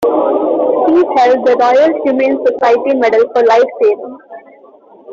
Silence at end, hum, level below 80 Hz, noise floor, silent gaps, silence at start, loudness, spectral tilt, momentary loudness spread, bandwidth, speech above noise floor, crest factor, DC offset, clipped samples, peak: 0 s; none; -58 dBFS; -41 dBFS; none; 0 s; -11 LUFS; -5 dB/octave; 3 LU; 7.4 kHz; 30 dB; 10 dB; under 0.1%; under 0.1%; -2 dBFS